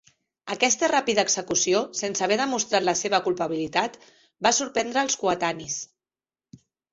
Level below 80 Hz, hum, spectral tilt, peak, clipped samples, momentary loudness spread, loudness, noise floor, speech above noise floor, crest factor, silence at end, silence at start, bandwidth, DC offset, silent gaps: -64 dBFS; none; -2 dB/octave; -4 dBFS; under 0.1%; 10 LU; -24 LUFS; under -90 dBFS; over 66 dB; 20 dB; 1.1 s; 0.45 s; 8 kHz; under 0.1%; none